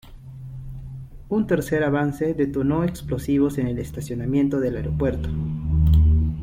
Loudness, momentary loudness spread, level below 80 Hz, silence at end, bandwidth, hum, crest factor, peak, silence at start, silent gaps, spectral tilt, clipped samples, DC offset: -23 LUFS; 18 LU; -30 dBFS; 0 s; 15.5 kHz; none; 14 dB; -8 dBFS; 0.05 s; none; -8.5 dB/octave; under 0.1%; under 0.1%